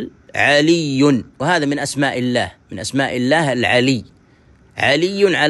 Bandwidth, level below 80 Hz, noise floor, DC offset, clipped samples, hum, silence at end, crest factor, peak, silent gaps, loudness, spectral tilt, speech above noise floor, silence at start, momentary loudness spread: 12 kHz; -54 dBFS; -50 dBFS; under 0.1%; under 0.1%; none; 0 s; 16 dB; -2 dBFS; none; -16 LUFS; -4.5 dB/octave; 34 dB; 0 s; 9 LU